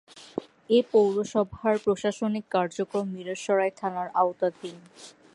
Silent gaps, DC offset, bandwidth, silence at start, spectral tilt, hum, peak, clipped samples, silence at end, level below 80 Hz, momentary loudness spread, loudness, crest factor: none; under 0.1%; 11.5 kHz; 0.15 s; -5.5 dB/octave; none; -10 dBFS; under 0.1%; 0.25 s; -64 dBFS; 15 LU; -26 LUFS; 18 dB